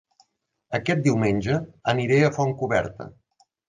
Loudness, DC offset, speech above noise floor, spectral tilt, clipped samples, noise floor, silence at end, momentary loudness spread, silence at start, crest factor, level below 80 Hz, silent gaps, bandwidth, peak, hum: -23 LUFS; under 0.1%; 47 dB; -6.5 dB/octave; under 0.1%; -70 dBFS; 0.6 s; 12 LU; 0.7 s; 18 dB; -52 dBFS; none; 9.6 kHz; -8 dBFS; none